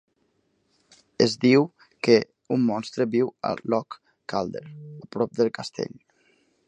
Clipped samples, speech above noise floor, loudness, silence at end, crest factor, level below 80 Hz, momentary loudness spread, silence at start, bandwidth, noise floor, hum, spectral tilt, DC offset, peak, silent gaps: under 0.1%; 46 dB; -24 LUFS; 0.8 s; 22 dB; -66 dBFS; 17 LU; 1.2 s; 9.6 kHz; -70 dBFS; none; -6 dB/octave; under 0.1%; -2 dBFS; none